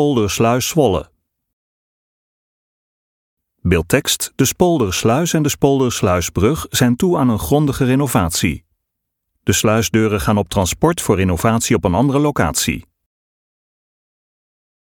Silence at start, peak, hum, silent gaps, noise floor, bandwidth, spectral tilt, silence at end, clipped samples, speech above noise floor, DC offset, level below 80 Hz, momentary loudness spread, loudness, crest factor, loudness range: 0 s; 0 dBFS; none; 1.53-3.37 s; -76 dBFS; 18.5 kHz; -5 dB/octave; 2.05 s; under 0.1%; 61 dB; under 0.1%; -38 dBFS; 4 LU; -16 LUFS; 18 dB; 5 LU